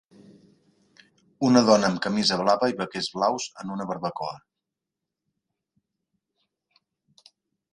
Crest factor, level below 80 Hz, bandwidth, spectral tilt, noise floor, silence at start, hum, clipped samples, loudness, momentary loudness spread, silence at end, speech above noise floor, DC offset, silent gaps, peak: 22 dB; -66 dBFS; 10.5 kHz; -4.5 dB/octave; -86 dBFS; 1.4 s; none; under 0.1%; -24 LUFS; 14 LU; 3.35 s; 63 dB; under 0.1%; none; -4 dBFS